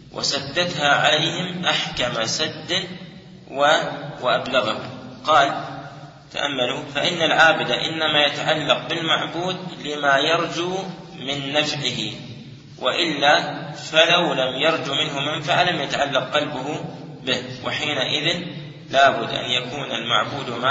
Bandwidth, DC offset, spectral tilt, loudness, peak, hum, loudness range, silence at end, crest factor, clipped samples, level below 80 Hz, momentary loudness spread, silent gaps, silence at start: 8 kHz; under 0.1%; -3 dB/octave; -20 LUFS; 0 dBFS; none; 4 LU; 0 s; 22 dB; under 0.1%; -58 dBFS; 13 LU; none; 0 s